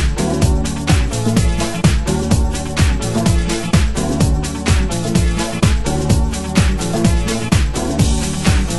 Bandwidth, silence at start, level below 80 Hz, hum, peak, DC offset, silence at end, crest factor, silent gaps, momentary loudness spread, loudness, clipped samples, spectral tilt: 12.5 kHz; 0 s; -20 dBFS; none; 0 dBFS; under 0.1%; 0 s; 14 dB; none; 2 LU; -16 LUFS; under 0.1%; -5.5 dB/octave